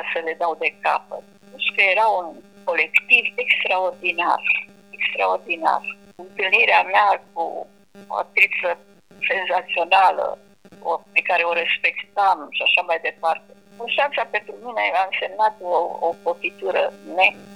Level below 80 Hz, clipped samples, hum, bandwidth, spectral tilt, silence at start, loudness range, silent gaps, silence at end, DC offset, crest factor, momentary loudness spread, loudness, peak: -72 dBFS; under 0.1%; none; 14 kHz; -2.5 dB/octave; 0 s; 3 LU; none; 0 s; 0.1%; 20 dB; 13 LU; -20 LUFS; -2 dBFS